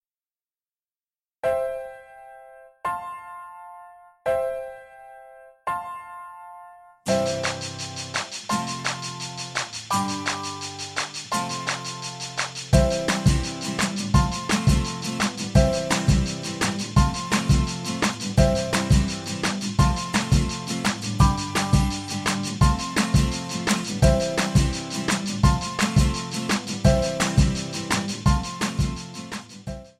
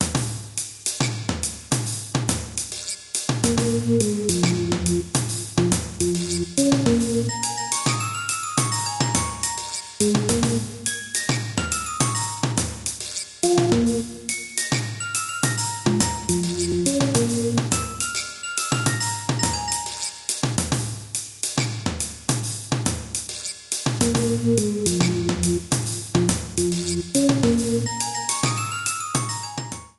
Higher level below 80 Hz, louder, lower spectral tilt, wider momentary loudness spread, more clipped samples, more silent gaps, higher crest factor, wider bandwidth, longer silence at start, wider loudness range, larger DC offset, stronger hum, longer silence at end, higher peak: first, -32 dBFS vs -44 dBFS; about the same, -24 LUFS vs -23 LUFS; about the same, -4.5 dB/octave vs -4 dB/octave; first, 13 LU vs 7 LU; neither; neither; about the same, 22 dB vs 20 dB; first, 14.5 kHz vs 13 kHz; first, 1.45 s vs 0 s; first, 10 LU vs 3 LU; neither; neither; about the same, 0.1 s vs 0.1 s; about the same, -2 dBFS vs -4 dBFS